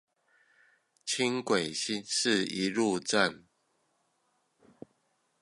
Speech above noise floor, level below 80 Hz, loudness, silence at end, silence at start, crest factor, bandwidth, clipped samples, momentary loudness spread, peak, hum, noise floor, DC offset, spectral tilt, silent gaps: 45 dB; -74 dBFS; -29 LUFS; 2.05 s; 1.05 s; 24 dB; 11.5 kHz; under 0.1%; 5 LU; -10 dBFS; none; -75 dBFS; under 0.1%; -3 dB/octave; none